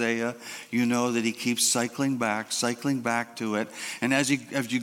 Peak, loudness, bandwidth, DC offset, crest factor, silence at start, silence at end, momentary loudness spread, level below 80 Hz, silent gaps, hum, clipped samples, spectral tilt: -8 dBFS; -27 LUFS; 17 kHz; under 0.1%; 20 dB; 0 s; 0 s; 7 LU; -74 dBFS; none; none; under 0.1%; -3 dB/octave